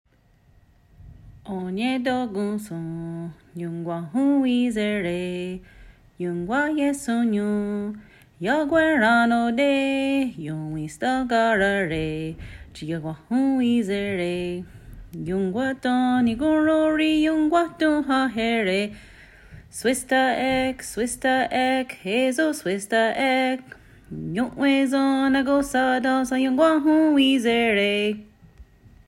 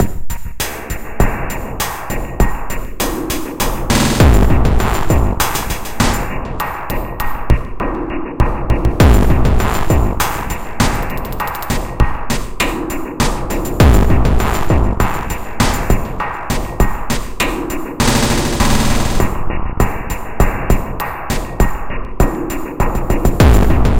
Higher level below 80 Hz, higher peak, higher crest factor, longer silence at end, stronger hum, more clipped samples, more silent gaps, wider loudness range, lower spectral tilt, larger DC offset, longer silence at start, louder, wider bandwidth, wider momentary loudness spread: second, -52 dBFS vs -18 dBFS; second, -6 dBFS vs 0 dBFS; about the same, 16 dB vs 14 dB; first, 0.45 s vs 0 s; neither; neither; neither; about the same, 6 LU vs 4 LU; about the same, -5 dB/octave vs -5 dB/octave; second, under 0.1% vs 2%; first, 1.05 s vs 0 s; second, -22 LUFS vs -17 LUFS; about the same, 15.5 kHz vs 17 kHz; about the same, 13 LU vs 11 LU